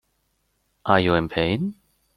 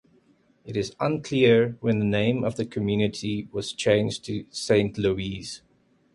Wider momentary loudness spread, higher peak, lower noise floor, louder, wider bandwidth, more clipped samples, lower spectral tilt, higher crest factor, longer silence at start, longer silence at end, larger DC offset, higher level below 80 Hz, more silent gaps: about the same, 12 LU vs 12 LU; first, -2 dBFS vs -8 dBFS; first, -70 dBFS vs -62 dBFS; first, -22 LUFS vs -25 LUFS; about the same, 12.5 kHz vs 11.5 kHz; neither; first, -7.5 dB/octave vs -6 dB/octave; about the same, 22 dB vs 18 dB; first, 0.85 s vs 0.65 s; about the same, 0.45 s vs 0.55 s; neither; about the same, -50 dBFS vs -52 dBFS; neither